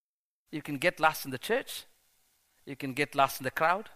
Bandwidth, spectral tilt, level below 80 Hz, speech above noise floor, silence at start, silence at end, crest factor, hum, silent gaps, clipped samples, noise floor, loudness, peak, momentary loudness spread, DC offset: 15.5 kHz; -4 dB/octave; -66 dBFS; 51 dB; 0.5 s; 0 s; 24 dB; none; none; under 0.1%; -81 dBFS; -30 LUFS; -10 dBFS; 15 LU; under 0.1%